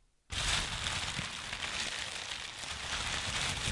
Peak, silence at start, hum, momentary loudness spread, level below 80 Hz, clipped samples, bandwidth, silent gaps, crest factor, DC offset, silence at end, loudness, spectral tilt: -18 dBFS; 0.3 s; none; 7 LU; -50 dBFS; under 0.1%; 11.5 kHz; none; 18 dB; under 0.1%; 0 s; -35 LUFS; -1.5 dB/octave